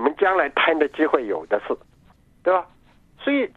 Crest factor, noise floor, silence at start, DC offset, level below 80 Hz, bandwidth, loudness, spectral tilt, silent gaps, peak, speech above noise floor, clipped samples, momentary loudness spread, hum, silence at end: 20 dB; -53 dBFS; 0 s; under 0.1%; -60 dBFS; 7.2 kHz; -22 LUFS; -5.5 dB/octave; none; -4 dBFS; 32 dB; under 0.1%; 9 LU; none; 0.1 s